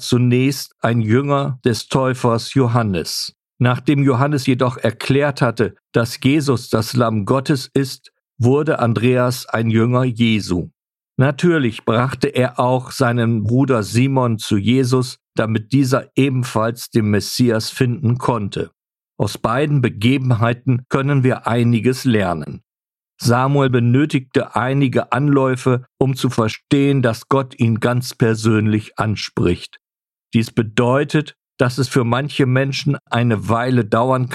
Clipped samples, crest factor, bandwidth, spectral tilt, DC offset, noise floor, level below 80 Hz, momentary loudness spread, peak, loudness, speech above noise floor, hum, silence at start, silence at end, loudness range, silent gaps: under 0.1%; 16 dB; 13.5 kHz; -6.5 dB/octave; under 0.1%; under -90 dBFS; -50 dBFS; 6 LU; 0 dBFS; -17 LUFS; over 73 dB; none; 0 s; 0 s; 2 LU; none